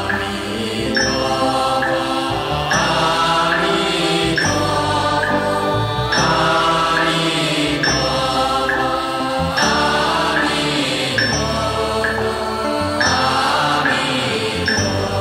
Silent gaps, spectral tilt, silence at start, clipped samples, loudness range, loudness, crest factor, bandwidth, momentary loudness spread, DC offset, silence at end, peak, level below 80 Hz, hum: none; -3.5 dB/octave; 0 s; under 0.1%; 1 LU; -17 LUFS; 14 dB; 16 kHz; 5 LU; under 0.1%; 0 s; -2 dBFS; -38 dBFS; none